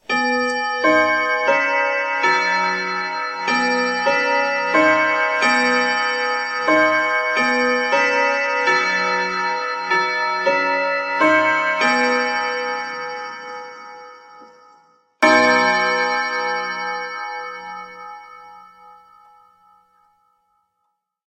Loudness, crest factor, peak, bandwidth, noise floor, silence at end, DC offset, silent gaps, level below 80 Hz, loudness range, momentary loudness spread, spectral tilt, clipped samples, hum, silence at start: -17 LUFS; 18 dB; 0 dBFS; 10.5 kHz; -73 dBFS; 2.35 s; under 0.1%; none; -66 dBFS; 8 LU; 13 LU; -3 dB/octave; under 0.1%; none; 0.1 s